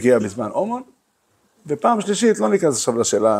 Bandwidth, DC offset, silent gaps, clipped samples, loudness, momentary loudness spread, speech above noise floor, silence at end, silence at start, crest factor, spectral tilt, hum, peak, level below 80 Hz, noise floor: 15.5 kHz; under 0.1%; none; under 0.1%; -19 LUFS; 8 LU; 46 dB; 0 s; 0 s; 16 dB; -4.5 dB/octave; none; -4 dBFS; -64 dBFS; -64 dBFS